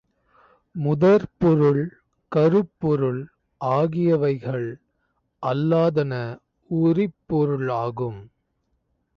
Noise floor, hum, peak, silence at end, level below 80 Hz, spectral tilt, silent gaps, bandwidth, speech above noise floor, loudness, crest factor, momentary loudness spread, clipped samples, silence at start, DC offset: -72 dBFS; none; -8 dBFS; 0.9 s; -56 dBFS; -10 dB/octave; none; 6.6 kHz; 51 dB; -22 LUFS; 14 dB; 14 LU; under 0.1%; 0.75 s; under 0.1%